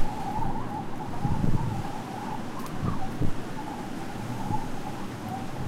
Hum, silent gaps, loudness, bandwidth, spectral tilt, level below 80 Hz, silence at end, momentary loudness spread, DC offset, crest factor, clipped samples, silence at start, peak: none; none; -33 LUFS; 13.5 kHz; -6.5 dB/octave; -36 dBFS; 0 s; 7 LU; under 0.1%; 16 dB; under 0.1%; 0 s; -12 dBFS